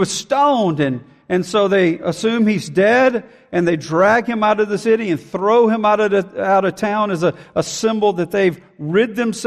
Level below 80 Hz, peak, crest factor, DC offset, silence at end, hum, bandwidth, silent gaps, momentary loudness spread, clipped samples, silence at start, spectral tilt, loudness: -58 dBFS; -4 dBFS; 12 dB; under 0.1%; 0 s; none; 14 kHz; none; 7 LU; under 0.1%; 0 s; -5.5 dB/octave; -17 LUFS